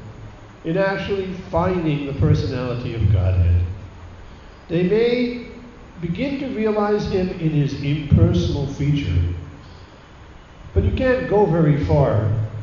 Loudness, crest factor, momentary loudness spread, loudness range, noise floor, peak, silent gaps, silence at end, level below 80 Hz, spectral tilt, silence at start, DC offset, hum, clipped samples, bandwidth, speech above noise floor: -20 LUFS; 20 dB; 18 LU; 2 LU; -42 dBFS; 0 dBFS; none; 0 s; -34 dBFS; -8.5 dB/octave; 0 s; under 0.1%; none; under 0.1%; 7 kHz; 24 dB